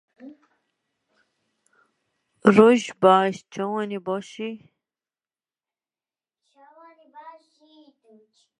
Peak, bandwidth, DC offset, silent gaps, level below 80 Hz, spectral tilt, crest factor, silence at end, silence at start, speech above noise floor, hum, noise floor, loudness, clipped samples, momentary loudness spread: 0 dBFS; 10.5 kHz; under 0.1%; none; -72 dBFS; -6 dB/octave; 26 dB; 1.3 s; 0.25 s; over 70 dB; none; under -90 dBFS; -20 LUFS; under 0.1%; 19 LU